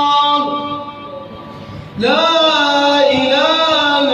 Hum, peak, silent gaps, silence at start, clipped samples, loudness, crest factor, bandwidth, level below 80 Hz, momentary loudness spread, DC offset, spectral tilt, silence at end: none; 0 dBFS; none; 0 s; under 0.1%; -12 LUFS; 14 dB; 10 kHz; -52 dBFS; 20 LU; under 0.1%; -3.5 dB/octave; 0 s